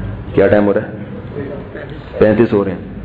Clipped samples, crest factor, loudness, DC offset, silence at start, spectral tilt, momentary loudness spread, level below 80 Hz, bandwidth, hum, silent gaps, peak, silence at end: under 0.1%; 14 dB; -14 LUFS; under 0.1%; 0 s; -10 dB/octave; 17 LU; -36 dBFS; 4.9 kHz; none; none; 0 dBFS; 0 s